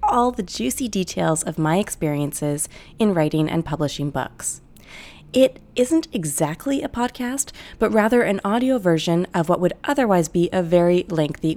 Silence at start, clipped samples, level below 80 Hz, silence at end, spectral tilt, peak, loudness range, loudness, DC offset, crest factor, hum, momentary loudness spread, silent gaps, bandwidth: 0 s; under 0.1%; -48 dBFS; 0 s; -5 dB/octave; -2 dBFS; 3 LU; -21 LUFS; under 0.1%; 18 dB; none; 8 LU; none; 18.5 kHz